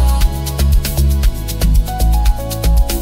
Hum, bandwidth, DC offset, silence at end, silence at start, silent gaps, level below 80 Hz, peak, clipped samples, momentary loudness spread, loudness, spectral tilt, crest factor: none; 16.5 kHz; under 0.1%; 0 s; 0 s; none; -14 dBFS; -2 dBFS; under 0.1%; 3 LU; -16 LUFS; -5 dB/octave; 10 dB